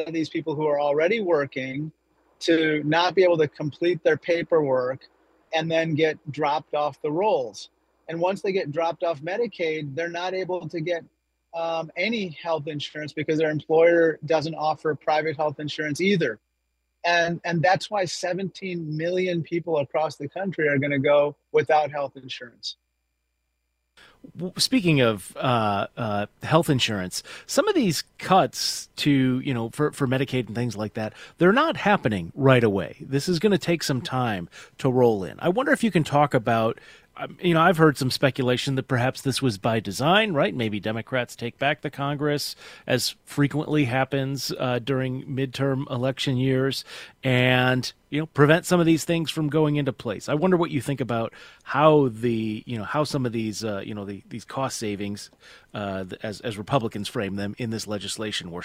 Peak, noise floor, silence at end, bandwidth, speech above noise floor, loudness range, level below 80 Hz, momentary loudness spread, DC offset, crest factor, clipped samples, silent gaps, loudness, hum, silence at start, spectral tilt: -2 dBFS; -76 dBFS; 0 s; 16 kHz; 52 dB; 6 LU; -60 dBFS; 12 LU; under 0.1%; 24 dB; under 0.1%; none; -24 LUFS; none; 0 s; -5.5 dB/octave